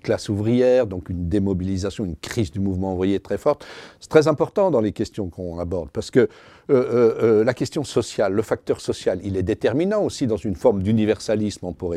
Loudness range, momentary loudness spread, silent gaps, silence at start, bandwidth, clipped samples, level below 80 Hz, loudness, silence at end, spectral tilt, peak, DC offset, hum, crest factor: 2 LU; 10 LU; none; 0.05 s; 13.5 kHz; under 0.1%; -50 dBFS; -22 LUFS; 0 s; -6.5 dB/octave; 0 dBFS; under 0.1%; none; 20 dB